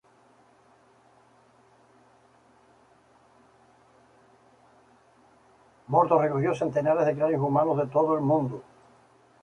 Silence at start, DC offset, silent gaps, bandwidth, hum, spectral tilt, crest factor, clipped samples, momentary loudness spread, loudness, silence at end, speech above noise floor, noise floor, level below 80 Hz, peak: 5.9 s; under 0.1%; none; 10 kHz; none; -9 dB/octave; 22 dB; under 0.1%; 4 LU; -25 LUFS; 0.8 s; 36 dB; -60 dBFS; -68 dBFS; -8 dBFS